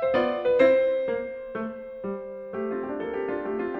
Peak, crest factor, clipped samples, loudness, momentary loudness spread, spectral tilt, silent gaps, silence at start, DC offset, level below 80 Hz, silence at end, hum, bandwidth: -8 dBFS; 18 dB; under 0.1%; -27 LUFS; 15 LU; -7.5 dB/octave; none; 0 s; under 0.1%; -60 dBFS; 0 s; none; 5.8 kHz